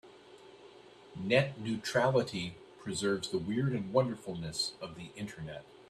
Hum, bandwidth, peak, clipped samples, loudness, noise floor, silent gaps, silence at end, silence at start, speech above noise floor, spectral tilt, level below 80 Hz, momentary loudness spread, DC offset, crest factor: none; 13.5 kHz; -12 dBFS; under 0.1%; -33 LUFS; -55 dBFS; none; 0.05 s; 0.05 s; 22 dB; -5 dB/octave; -66 dBFS; 15 LU; under 0.1%; 22 dB